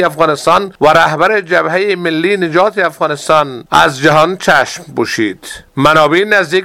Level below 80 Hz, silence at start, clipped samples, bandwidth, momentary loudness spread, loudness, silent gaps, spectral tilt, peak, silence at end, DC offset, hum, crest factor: -44 dBFS; 0 s; 0.5%; 16.5 kHz; 8 LU; -11 LUFS; none; -4.5 dB/octave; 0 dBFS; 0 s; 0.3%; none; 12 dB